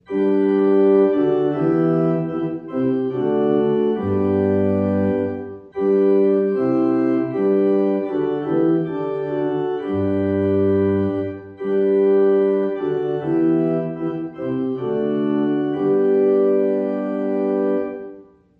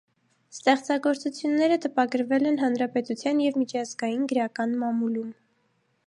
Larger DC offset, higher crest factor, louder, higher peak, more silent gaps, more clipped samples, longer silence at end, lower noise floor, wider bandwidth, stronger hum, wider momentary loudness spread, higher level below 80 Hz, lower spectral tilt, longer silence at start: neither; second, 12 dB vs 18 dB; first, -19 LUFS vs -26 LUFS; about the same, -6 dBFS vs -8 dBFS; neither; neither; second, 0.35 s vs 0.75 s; second, -43 dBFS vs -70 dBFS; second, 4.2 kHz vs 11 kHz; neither; about the same, 8 LU vs 6 LU; first, -60 dBFS vs -80 dBFS; first, -10.5 dB/octave vs -4.5 dB/octave; second, 0.1 s vs 0.55 s